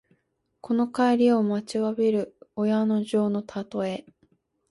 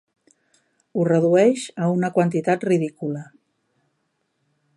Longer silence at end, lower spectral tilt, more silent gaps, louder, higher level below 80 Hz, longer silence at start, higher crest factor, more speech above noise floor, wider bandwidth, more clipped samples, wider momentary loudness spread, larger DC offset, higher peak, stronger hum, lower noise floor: second, 0.7 s vs 1.55 s; about the same, -7 dB/octave vs -7 dB/octave; neither; second, -25 LUFS vs -21 LUFS; about the same, -68 dBFS vs -70 dBFS; second, 0.65 s vs 0.95 s; about the same, 14 dB vs 18 dB; about the same, 49 dB vs 52 dB; about the same, 11.5 kHz vs 11.5 kHz; neither; second, 10 LU vs 13 LU; neither; second, -10 dBFS vs -6 dBFS; neither; about the same, -73 dBFS vs -72 dBFS